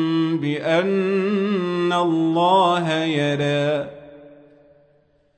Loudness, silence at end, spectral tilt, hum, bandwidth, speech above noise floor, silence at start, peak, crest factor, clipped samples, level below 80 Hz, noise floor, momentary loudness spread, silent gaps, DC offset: -20 LUFS; 1.05 s; -6.5 dB/octave; none; 9.2 kHz; 40 dB; 0 s; -6 dBFS; 14 dB; under 0.1%; -66 dBFS; -60 dBFS; 5 LU; none; under 0.1%